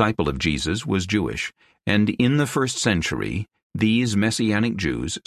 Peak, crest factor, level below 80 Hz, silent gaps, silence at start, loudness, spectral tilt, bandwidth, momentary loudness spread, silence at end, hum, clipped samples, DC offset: -4 dBFS; 18 dB; -40 dBFS; 3.63-3.70 s; 0 s; -22 LUFS; -5 dB/octave; 14 kHz; 9 LU; 0.05 s; none; under 0.1%; under 0.1%